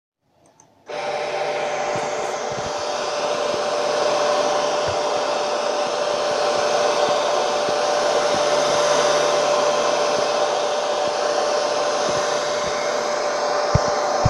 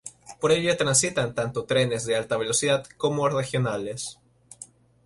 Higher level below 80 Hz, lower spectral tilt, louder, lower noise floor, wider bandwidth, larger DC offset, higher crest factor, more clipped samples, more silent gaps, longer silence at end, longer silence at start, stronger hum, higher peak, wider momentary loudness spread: first, -50 dBFS vs -58 dBFS; about the same, -3 dB/octave vs -3.5 dB/octave; first, -21 LUFS vs -24 LUFS; first, -56 dBFS vs -49 dBFS; about the same, 12 kHz vs 11.5 kHz; neither; about the same, 20 dB vs 20 dB; neither; neither; second, 0 s vs 0.4 s; first, 0.9 s vs 0.05 s; neither; first, -2 dBFS vs -6 dBFS; second, 6 LU vs 19 LU